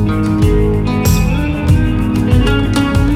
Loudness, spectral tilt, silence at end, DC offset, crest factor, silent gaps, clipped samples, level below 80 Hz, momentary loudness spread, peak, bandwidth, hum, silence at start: -13 LUFS; -6.5 dB/octave; 0 s; under 0.1%; 12 dB; none; under 0.1%; -18 dBFS; 2 LU; 0 dBFS; 16 kHz; none; 0 s